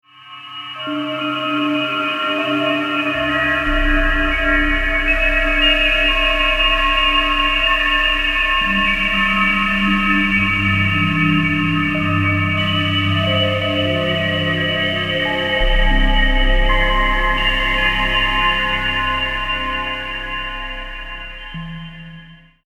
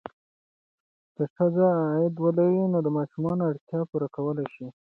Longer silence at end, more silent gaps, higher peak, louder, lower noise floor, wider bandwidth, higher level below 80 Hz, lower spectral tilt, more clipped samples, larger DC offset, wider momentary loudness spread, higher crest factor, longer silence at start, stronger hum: about the same, 0.3 s vs 0.25 s; second, none vs 1.30-1.36 s, 3.61-3.67 s; first, -2 dBFS vs -10 dBFS; first, -16 LUFS vs -26 LUFS; second, -41 dBFS vs under -90 dBFS; first, 10.5 kHz vs 4.1 kHz; first, -24 dBFS vs -68 dBFS; second, -5.5 dB/octave vs -12 dB/octave; neither; neither; about the same, 10 LU vs 10 LU; about the same, 14 dB vs 16 dB; second, 0.2 s vs 1.2 s; neither